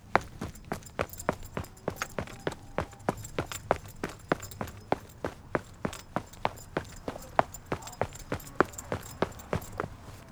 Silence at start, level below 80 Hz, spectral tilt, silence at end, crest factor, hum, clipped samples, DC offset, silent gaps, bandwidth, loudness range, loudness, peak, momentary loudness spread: 0 s; -50 dBFS; -5 dB/octave; 0 s; 34 dB; none; under 0.1%; under 0.1%; none; over 20 kHz; 2 LU; -35 LUFS; -2 dBFS; 10 LU